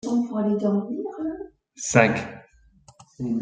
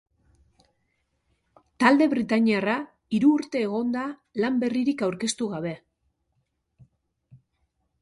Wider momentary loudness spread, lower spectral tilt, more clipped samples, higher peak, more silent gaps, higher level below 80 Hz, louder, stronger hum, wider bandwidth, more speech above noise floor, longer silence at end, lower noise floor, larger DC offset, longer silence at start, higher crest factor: first, 18 LU vs 10 LU; about the same, -5.5 dB/octave vs -5 dB/octave; neither; about the same, -2 dBFS vs -4 dBFS; neither; first, -60 dBFS vs -68 dBFS; about the same, -24 LUFS vs -24 LUFS; neither; second, 9.4 kHz vs 11.5 kHz; second, 32 dB vs 51 dB; second, 0 s vs 0.65 s; second, -55 dBFS vs -75 dBFS; neither; second, 0.05 s vs 1.8 s; about the same, 22 dB vs 22 dB